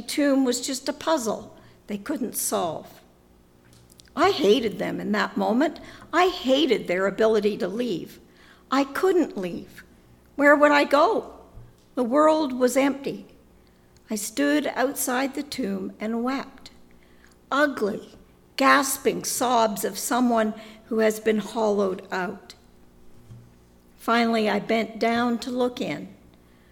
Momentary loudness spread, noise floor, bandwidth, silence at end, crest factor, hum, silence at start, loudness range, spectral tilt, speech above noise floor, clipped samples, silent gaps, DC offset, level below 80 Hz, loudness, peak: 14 LU; -56 dBFS; 18.5 kHz; 0.6 s; 20 dB; none; 0 s; 6 LU; -3.5 dB/octave; 33 dB; under 0.1%; none; under 0.1%; -58 dBFS; -23 LUFS; -4 dBFS